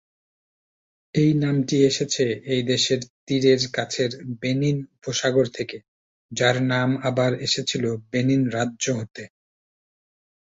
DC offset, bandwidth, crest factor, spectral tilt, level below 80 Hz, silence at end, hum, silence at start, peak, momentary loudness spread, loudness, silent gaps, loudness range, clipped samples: under 0.1%; 8 kHz; 18 dB; -5 dB/octave; -60 dBFS; 1.2 s; none; 1.15 s; -6 dBFS; 9 LU; -23 LUFS; 3.10-3.27 s, 5.88-6.29 s; 3 LU; under 0.1%